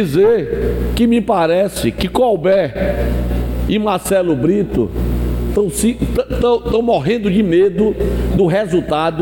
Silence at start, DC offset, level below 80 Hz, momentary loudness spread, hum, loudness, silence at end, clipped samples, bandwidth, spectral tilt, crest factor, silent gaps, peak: 0 s; under 0.1%; -24 dBFS; 6 LU; none; -15 LUFS; 0 s; under 0.1%; 17 kHz; -6.5 dB/octave; 10 dB; none; -4 dBFS